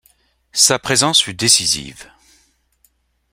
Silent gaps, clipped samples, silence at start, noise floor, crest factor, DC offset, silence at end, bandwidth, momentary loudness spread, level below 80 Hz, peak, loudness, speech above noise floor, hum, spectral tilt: none; under 0.1%; 0.55 s; -61 dBFS; 20 dB; under 0.1%; 1.3 s; 16.5 kHz; 10 LU; -52 dBFS; 0 dBFS; -13 LUFS; 45 dB; none; -1 dB/octave